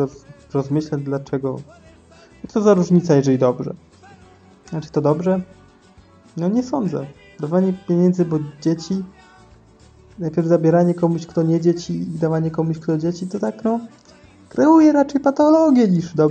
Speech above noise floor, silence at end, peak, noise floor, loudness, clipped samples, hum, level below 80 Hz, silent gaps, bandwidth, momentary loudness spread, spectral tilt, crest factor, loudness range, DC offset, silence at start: 31 dB; 0 s; -2 dBFS; -49 dBFS; -19 LUFS; under 0.1%; none; -56 dBFS; none; 8.4 kHz; 15 LU; -8 dB/octave; 16 dB; 5 LU; under 0.1%; 0 s